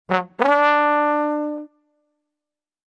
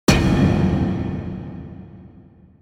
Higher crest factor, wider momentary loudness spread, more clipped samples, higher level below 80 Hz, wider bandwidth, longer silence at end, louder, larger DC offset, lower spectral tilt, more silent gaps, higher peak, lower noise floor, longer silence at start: about the same, 20 dB vs 20 dB; second, 12 LU vs 21 LU; neither; second, -72 dBFS vs -32 dBFS; second, 8 kHz vs 17 kHz; first, 1.25 s vs 0.6 s; about the same, -19 LUFS vs -20 LUFS; neither; about the same, -6 dB/octave vs -6 dB/octave; neither; about the same, 0 dBFS vs 0 dBFS; first, -87 dBFS vs -47 dBFS; about the same, 0.1 s vs 0.1 s